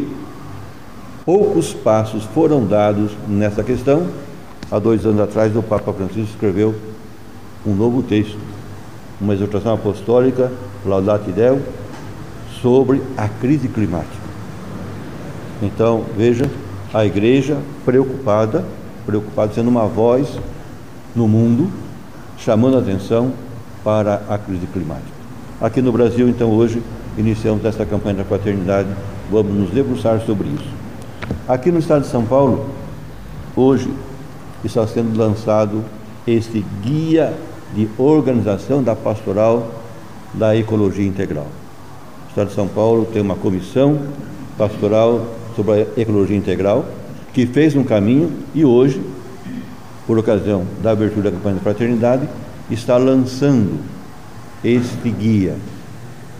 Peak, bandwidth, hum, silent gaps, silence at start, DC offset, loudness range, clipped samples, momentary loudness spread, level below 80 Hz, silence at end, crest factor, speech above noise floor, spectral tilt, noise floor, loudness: 0 dBFS; 15.5 kHz; none; none; 0 s; 2%; 3 LU; under 0.1%; 18 LU; -42 dBFS; 0 s; 16 dB; 22 dB; -8 dB/octave; -37 dBFS; -17 LUFS